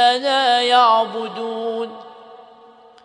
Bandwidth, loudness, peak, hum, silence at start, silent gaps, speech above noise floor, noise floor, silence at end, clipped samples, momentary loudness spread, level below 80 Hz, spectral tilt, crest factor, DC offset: 10.5 kHz; -17 LUFS; -2 dBFS; none; 0 s; none; 29 dB; -46 dBFS; 0.65 s; under 0.1%; 15 LU; -78 dBFS; -2 dB/octave; 18 dB; under 0.1%